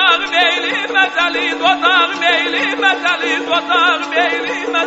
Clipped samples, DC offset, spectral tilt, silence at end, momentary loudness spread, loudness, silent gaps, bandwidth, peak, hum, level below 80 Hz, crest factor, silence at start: under 0.1%; under 0.1%; 2.5 dB/octave; 0 s; 4 LU; -13 LUFS; none; 8 kHz; 0 dBFS; none; -60 dBFS; 14 dB; 0 s